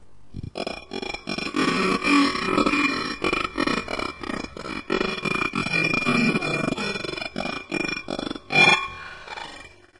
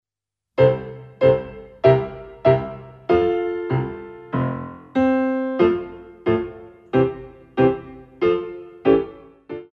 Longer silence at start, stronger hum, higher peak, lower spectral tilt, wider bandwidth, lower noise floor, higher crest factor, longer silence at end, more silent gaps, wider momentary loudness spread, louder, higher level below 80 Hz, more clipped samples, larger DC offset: second, 0 s vs 0.55 s; neither; about the same, -4 dBFS vs -2 dBFS; second, -4 dB/octave vs -9.5 dB/octave; first, 11.5 kHz vs 5.8 kHz; second, -44 dBFS vs -86 dBFS; about the same, 20 dB vs 20 dB; first, 0.3 s vs 0.1 s; neither; about the same, 15 LU vs 16 LU; about the same, -23 LUFS vs -21 LUFS; about the same, -48 dBFS vs -48 dBFS; neither; neither